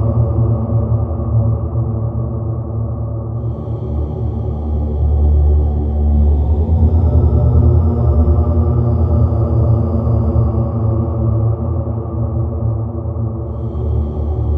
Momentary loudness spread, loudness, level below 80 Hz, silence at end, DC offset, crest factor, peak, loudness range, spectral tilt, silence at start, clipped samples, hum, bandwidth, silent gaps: 8 LU; -16 LUFS; -18 dBFS; 0 s; under 0.1%; 14 dB; 0 dBFS; 6 LU; -13 dB/octave; 0 s; under 0.1%; none; 1.6 kHz; none